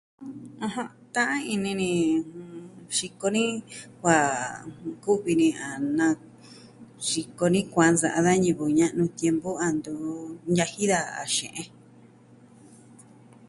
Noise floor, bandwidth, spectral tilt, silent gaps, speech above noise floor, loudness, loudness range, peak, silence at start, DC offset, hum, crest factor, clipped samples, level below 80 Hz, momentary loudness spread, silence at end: -53 dBFS; 11.5 kHz; -4.5 dB/octave; none; 28 dB; -26 LUFS; 5 LU; -6 dBFS; 0.2 s; under 0.1%; none; 22 dB; under 0.1%; -62 dBFS; 15 LU; 0.45 s